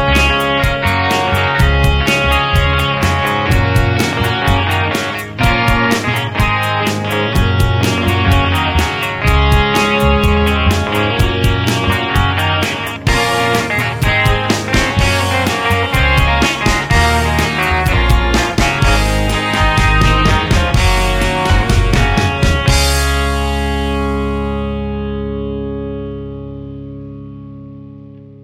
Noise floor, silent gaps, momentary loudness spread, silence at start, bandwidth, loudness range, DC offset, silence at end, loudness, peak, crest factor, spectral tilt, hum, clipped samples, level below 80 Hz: -35 dBFS; none; 9 LU; 0 s; 16.5 kHz; 5 LU; under 0.1%; 0.1 s; -13 LUFS; 0 dBFS; 14 dB; -5 dB/octave; none; under 0.1%; -20 dBFS